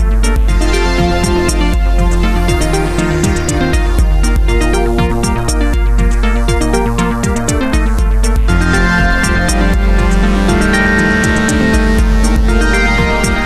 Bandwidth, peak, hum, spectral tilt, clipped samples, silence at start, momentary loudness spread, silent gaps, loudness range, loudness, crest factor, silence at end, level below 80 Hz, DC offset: 13.5 kHz; 0 dBFS; none; -5 dB/octave; under 0.1%; 0 s; 3 LU; none; 2 LU; -13 LUFS; 10 dB; 0 s; -12 dBFS; 1%